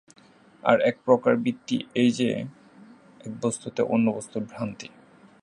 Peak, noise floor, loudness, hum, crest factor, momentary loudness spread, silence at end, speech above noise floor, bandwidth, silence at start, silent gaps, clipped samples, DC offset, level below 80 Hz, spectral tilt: -2 dBFS; -51 dBFS; -25 LUFS; none; 24 dB; 18 LU; 0.6 s; 27 dB; 11 kHz; 0.65 s; none; under 0.1%; under 0.1%; -70 dBFS; -5.5 dB/octave